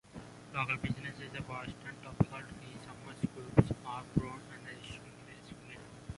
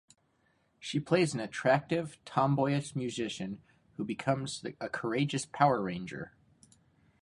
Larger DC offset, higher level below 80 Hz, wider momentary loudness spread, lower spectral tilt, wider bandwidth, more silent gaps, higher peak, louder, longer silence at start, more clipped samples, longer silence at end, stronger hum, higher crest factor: neither; first, -54 dBFS vs -68 dBFS; first, 20 LU vs 14 LU; first, -7 dB/octave vs -5.5 dB/octave; about the same, 11.5 kHz vs 11.5 kHz; neither; about the same, -10 dBFS vs -10 dBFS; second, -37 LUFS vs -32 LUFS; second, 0.05 s vs 0.8 s; neither; second, 0 s vs 0.95 s; neither; first, 30 dB vs 24 dB